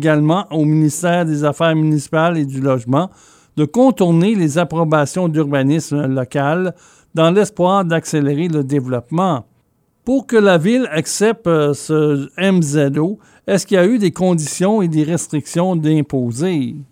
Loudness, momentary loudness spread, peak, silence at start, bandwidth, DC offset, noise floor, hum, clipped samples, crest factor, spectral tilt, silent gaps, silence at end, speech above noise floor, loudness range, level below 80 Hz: -16 LUFS; 6 LU; 0 dBFS; 0 s; 16 kHz; under 0.1%; -60 dBFS; none; under 0.1%; 14 dB; -6 dB/octave; none; 0.1 s; 45 dB; 1 LU; -58 dBFS